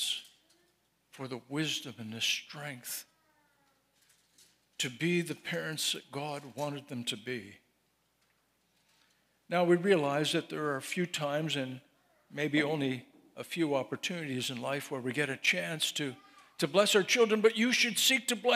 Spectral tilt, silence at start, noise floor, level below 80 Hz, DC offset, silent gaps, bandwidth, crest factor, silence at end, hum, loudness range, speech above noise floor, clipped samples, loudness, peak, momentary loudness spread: -3.5 dB/octave; 0 s; -75 dBFS; -84 dBFS; under 0.1%; none; 16 kHz; 22 dB; 0 s; none; 9 LU; 43 dB; under 0.1%; -31 LUFS; -10 dBFS; 15 LU